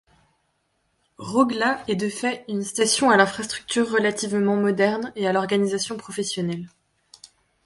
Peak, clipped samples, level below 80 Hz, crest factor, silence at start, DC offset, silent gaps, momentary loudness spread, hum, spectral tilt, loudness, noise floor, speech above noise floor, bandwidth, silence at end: -2 dBFS; under 0.1%; -64 dBFS; 22 dB; 1.2 s; under 0.1%; none; 10 LU; none; -4 dB/octave; -22 LUFS; -70 dBFS; 48 dB; 11.5 kHz; 0.4 s